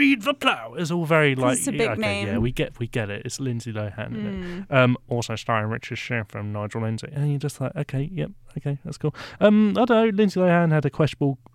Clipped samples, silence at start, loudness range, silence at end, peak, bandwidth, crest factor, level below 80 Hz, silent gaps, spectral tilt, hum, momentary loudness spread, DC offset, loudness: under 0.1%; 0 s; 7 LU; 0.2 s; -4 dBFS; 15.5 kHz; 18 dB; -48 dBFS; none; -6 dB/octave; none; 12 LU; under 0.1%; -23 LUFS